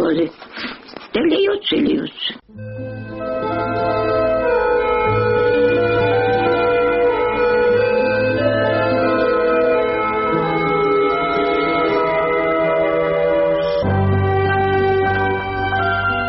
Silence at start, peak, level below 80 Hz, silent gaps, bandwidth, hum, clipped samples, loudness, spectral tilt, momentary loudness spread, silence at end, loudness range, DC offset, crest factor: 0 s; -4 dBFS; -42 dBFS; none; 5.8 kHz; none; under 0.1%; -17 LUFS; -4 dB/octave; 9 LU; 0 s; 4 LU; under 0.1%; 12 dB